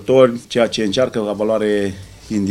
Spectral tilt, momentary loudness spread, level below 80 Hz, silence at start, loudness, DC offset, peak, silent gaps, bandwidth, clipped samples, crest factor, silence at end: -5.5 dB/octave; 11 LU; -48 dBFS; 0 s; -17 LUFS; under 0.1%; 0 dBFS; none; 13 kHz; under 0.1%; 16 dB; 0 s